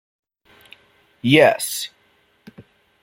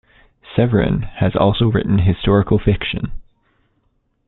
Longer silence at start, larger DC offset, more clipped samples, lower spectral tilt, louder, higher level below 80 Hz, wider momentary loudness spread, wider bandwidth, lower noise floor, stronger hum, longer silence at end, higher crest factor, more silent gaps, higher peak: first, 1.25 s vs 0.5 s; neither; neither; second, -4 dB/octave vs -12 dB/octave; about the same, -17 LUFS vs -17 LUFS; second, -64 dBFS vs -32 dBFS; first, 15 LU vs 8 LU; first, 16.5 kHz vs 4.1 kHz; second, -60 dBFS vs -64 dBFS; neither; second, 0.4 s vs 1.05 s; about the same, 20 dB vs 16 dB; neither; about the same, -2 dBFS vs -2 dBFS